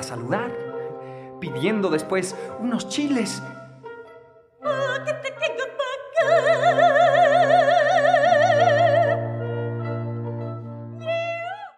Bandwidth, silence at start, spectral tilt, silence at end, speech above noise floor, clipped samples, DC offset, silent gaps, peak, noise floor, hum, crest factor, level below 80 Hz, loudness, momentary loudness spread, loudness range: 12.5 kHz; 0 s; -5 dB/octave; 0.1 s; 24 dB; under 0.1%; under 0.1%; none; -6 dBFS; -49 dBFS; none; 16 dB; -70 dBFS; -21 LUFS; 17 LU; 10 LU